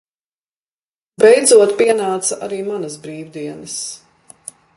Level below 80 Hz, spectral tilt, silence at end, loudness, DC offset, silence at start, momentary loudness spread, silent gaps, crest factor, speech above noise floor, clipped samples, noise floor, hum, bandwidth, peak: -66 dBFS; -2.5 dB/octave; 0.8 s; -14 LUFS; under 0.1%; 1.2 s; 24 LU; none; 18 dB; over 75 dB; under 0.1%; under -90 dBFS; none; 11.5 kHz; 0 dBFS